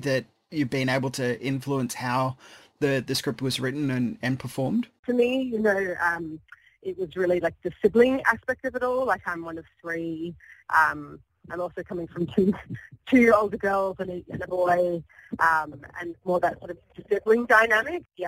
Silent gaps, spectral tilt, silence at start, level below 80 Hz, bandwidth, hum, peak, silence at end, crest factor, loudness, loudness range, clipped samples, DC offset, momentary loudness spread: 4.99-5.03 s; -5.5 dB/octave; 0 s; -58 dBFS; 16 kHz; none; -6 dBFS; 0 s; 20 dB; -25 LUFS; 4 LU; under 0.1%; under 0.1%; 17 LU